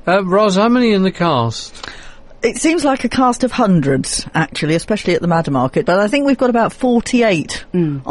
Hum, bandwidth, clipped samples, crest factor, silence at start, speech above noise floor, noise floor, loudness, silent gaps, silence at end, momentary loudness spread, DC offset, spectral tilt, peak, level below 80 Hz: none; 11.5 kHz; under 0.1%; 12 dB; 0.05 s; 20 dB; -35 dBFS; -15 LUFS; none; 0 s; 7 LU; under 0.1%; -5.5 dB/octave; -2 dBFS; -40 dBFS